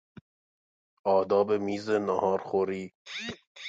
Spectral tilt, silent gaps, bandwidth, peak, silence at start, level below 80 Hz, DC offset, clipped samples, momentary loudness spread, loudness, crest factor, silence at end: -5.5 dB/octave; 2.95-3.05 s, 3.47-3.55 s; 7.8 kHz; -12 dBFS; 1.05 s; -66 dBFS; under 0.1%; under 0.1%; 13 LU; -29 LUFS; 18 dB; 0 s